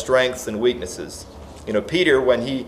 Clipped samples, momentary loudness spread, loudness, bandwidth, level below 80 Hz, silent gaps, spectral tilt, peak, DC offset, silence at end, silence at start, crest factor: under 0.1%; 19 LU; -20 LUFS; 15.5 kHz; -46 dBFS; none; -4 dB/octave; -4 dBFS; under 0.1%; 0 s; 0 s; 18 dB